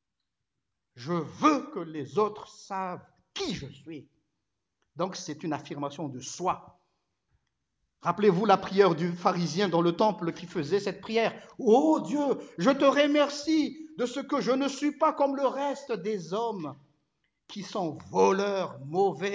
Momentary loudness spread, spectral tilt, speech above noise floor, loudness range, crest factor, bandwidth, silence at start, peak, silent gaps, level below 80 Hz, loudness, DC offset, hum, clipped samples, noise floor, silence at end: 14 LU; -5.5 dB/octave; 58 dB; 10 LU; 20 dB; 8 kHz; 0.95 s; -8 dBFS; none; -70 dBFS; -28 LUFS; under 0.1%; none; under 0.1%; -86 dBFS; 0 s